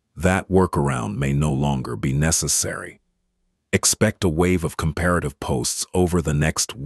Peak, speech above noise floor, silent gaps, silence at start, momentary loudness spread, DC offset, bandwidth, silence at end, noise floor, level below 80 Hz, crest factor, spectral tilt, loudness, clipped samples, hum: -2 dBFS; 50 dB; none; 0.15 s; 6 LU; under 0.1%; 12.5 kHz; 0 s; -71 dBFS; -36 dBFS; 20 dB; -4.5 dB/octave; -21 LUFS; under 0.1%; none